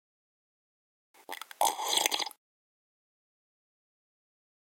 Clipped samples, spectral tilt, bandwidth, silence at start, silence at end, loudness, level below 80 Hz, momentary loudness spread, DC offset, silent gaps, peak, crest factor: under 0.1%; 2 dB/octave; 17 kHz; 1.3 s; 2.3 s; -29 LUFS; -86 dBFS; 17 LU; under 0.1%; none; -4 dBFS; 34 dB